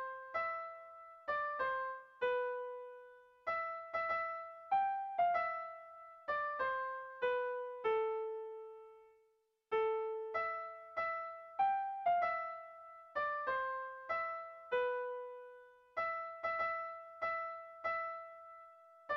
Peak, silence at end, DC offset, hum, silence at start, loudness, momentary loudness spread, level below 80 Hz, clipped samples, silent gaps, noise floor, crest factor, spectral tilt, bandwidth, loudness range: -24 dBFS; 0 s; under 0.1%; none; 0 s; -39 LUFS; 17 LU; -78 dBFS; under 0.1%; none; -77 dBFS; 16 dB; 0.5 dB/octave; 6.6 kHz; 3 LU